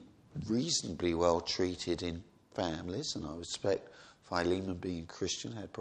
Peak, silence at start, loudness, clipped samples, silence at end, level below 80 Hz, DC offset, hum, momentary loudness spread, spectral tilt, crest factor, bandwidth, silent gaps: -14 dBFS; 0 s; -35 LUFS; under 0.1%; 0 s; -58 dBFS; under 0.1%; none; 11 LU; -4 dB/octave; 22 dB; 10 kHz; none